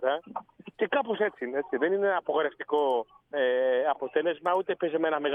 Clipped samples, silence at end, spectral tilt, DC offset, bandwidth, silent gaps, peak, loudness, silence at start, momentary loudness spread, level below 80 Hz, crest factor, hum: under 0.1%; 0 s; -6.5 dB/octave; under 0.1%; 3.8 kHz; none; -12 dBFS; -28 LUFS; 0 s; 7 LU; -78 dBFS; 16 dB; none